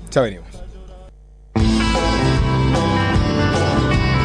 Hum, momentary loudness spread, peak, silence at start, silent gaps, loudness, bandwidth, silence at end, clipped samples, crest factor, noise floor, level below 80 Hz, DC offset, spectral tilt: none; 9 LU; -4 dBFS; 0 s; none; -18 LUFS; 10.5 kHz; 0 s; under 0.1%; 14 dB; -42 dBFS; -26 dBFS; under 0.1%; -6 dB/octave